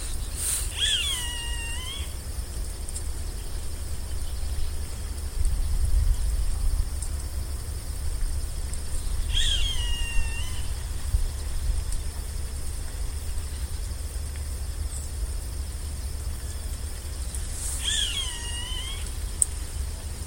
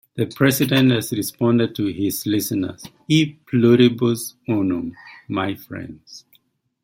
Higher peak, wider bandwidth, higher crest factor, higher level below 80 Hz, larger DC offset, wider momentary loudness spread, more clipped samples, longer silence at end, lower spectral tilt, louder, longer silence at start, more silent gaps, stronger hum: about the same, 0 dBFS vs -2 dBFS; about the same, 17 kHz vs 16.5 kHz; first, 28 dB vs 18 dB; first, -30 dBFS vs -58 dBFS; neither; second, 10 LU vs 16 LU; neither; second, 0 s vs 0.65 s; second, -2.5 dB/octave vs -5.5 dB/octave; second, -30 LUFS vs -20 LUFS; second, 0 s vs 0.15 s; neither; neither